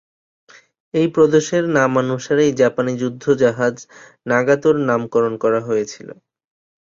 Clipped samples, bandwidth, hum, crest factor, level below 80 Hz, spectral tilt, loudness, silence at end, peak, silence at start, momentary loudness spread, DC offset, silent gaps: under 0.1%; 7.6 kHz; none; 16 dB; -58 dBFS; -6 dB/octave; -17 LUFS; 0.7 s; -2 dBFS; 0.95 s; 8 LU; under 0.1%; none